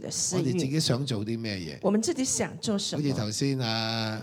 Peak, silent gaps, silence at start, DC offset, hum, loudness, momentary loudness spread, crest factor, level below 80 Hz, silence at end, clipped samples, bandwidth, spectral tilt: -12 dBFS; none; 0 s; under 0.1%; none; -28 LUFS; 4 LU; 16 dB; -62 dBFS; 0 s; under 0.1%; 18 kHz; -4 dB/octave